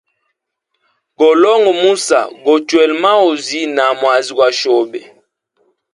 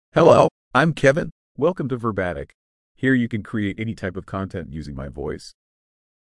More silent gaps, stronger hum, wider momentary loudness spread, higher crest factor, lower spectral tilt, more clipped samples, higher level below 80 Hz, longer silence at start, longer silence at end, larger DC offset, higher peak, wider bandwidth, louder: second, none vs 0.51-0.71 s, 1.32-1.55 s, 2.54-2.95 s; neither; second, 6 LU vs 18 LU; second, 14 dB vs 22 dB; second, -2.5 dB/octave vs -7 dB/octave; neither; second, -64 dBFS vs -48 dBFS; first, 1.2 s vs 0.15 s; first, 0.95 s vs 0.75 s; neither; about the same, 0 dBFS vs 0 dBFS; about the same, 11.5 kHz vs 11.5 kHz; first, -12 LUFS vs -21 LUFS